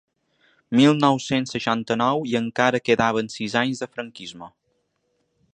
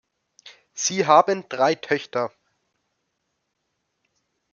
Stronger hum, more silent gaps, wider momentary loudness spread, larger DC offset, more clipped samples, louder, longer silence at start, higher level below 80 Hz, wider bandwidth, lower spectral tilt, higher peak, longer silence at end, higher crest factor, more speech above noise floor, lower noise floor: neither; neither; first, 16 LU vs 12 LU; neither; neither; about the same, -21 LUFS vs -21 LUFS; first, 0.7 s vs 0.45 s; first, -62 dBFS vs -74 dBFS; first, 9.6 kHz vs 7.4 kHz; first, -5 dB/octave vs -3 dB/octave; about the same, -2 dBFS vs -2 dBFS; second, 1.05 s vs 2.25 s; about the same, 22 dB vs 22 dB; second, 50 dB vs 56 dB; second, -71 dBFS vs -76 dBFS